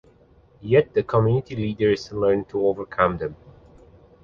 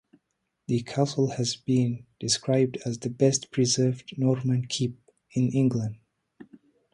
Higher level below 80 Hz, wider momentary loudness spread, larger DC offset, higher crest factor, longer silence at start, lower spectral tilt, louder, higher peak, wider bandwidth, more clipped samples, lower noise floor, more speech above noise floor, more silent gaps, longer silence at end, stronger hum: first, -50 dBFS vs -64 dBFS; about the same, 9 LU vs 9 LU; neither; about the same, 20 dB vs 18 dB; about the same, 0.6 s vs 0.7 s; first, -8 dB/octave vs -5.5 dB/octave; first, -22 LUFS vs -26 LUFS; first, -2 dBFS vs -8 dBFS; second, 7.2 kHz vs 11.5 kHz; neither; second, -55 dBFS vs -77 dBFS; second, 33 dB vs 52 dB; neither; first, 0.9 s vs 0.5 s; neither